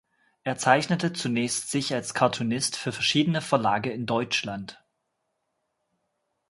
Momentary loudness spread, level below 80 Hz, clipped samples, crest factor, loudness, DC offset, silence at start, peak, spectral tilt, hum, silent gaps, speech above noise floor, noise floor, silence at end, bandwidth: 9 LU; -66 dBFS; under 0.1%; 24 dB; -26 LUFS; under 0.1%; 0.45 s; -4 dBFS; -4 dB/octave; none; none; 52 dB; -78 dBFS; 1.75 s; 11.5 kHz